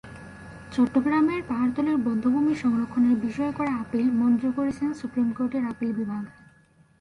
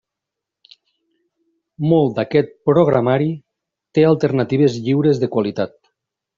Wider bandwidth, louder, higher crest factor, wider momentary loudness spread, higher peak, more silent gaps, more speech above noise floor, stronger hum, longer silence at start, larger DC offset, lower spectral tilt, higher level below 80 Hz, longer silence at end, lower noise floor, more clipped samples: first, 10.5 kHz vs 7.4 kHz; second, -25 LUFS vs -17 LUFS; about the same, 14 dB vs 16 dB; about the same, 10 LU vs 9 LU; second, -12 dBFS vs -2 dBFS; neither; second, 34 dB vs 67 dB; neither; second, 0.05 s vs 1.8 s; neither; about the same, -7.5 dB/octave vs -7.5 dB/octave; about the same, -56 dBFS vs -58 dBFS; about the same, 0.7 s vs 0.7 s; second, -59 dBFS vs -83 dBFS; neither